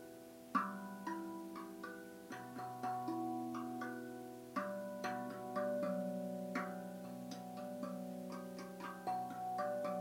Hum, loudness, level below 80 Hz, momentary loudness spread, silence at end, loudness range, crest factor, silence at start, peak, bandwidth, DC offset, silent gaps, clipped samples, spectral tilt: none; -44 LUFS; -82 dBFS; 9 LU; 0 s; 3 LU; 20 dB; 0 s; -24 dBFS; 16 kHz; under 0.1%; none; under 0.1%; -6 dB/octave